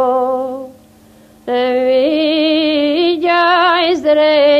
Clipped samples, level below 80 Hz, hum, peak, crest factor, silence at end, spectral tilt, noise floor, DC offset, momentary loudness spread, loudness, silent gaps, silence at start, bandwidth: under 0.1%; -56 dBFS; none; -2 dBFS; 12 dB; 0 s; -4.5 dB/octave; -44 dBFS; under 0.1%; 10 LU; -13 LUFS; none; 0 s; 8.6 kHz